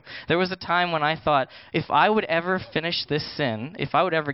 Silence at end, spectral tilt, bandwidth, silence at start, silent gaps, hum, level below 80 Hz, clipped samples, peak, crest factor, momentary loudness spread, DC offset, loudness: 0 s; -9.5 dB/octave; 5.8 kHz; 0.05 s; none; none; -58 dBFS; under 0.1%; -6 dBFS; 18 dB; 7 LU; under 0.1%; -24 LUFS